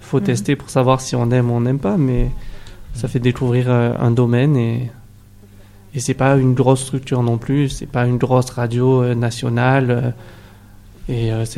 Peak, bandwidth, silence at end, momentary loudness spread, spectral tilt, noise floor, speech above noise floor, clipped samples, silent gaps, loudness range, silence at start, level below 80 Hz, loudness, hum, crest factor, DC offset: 0 dBFS; 12.5 kHz; 0 s; 10 LU; -7 dB/octave; -43 dBFS; 26 dB; under 0.1%; none; 2 LU; 0 s; -34 dBFS; -17 LUFS; 50 Hz at -45 dBFS; 16 dB; under 0.1%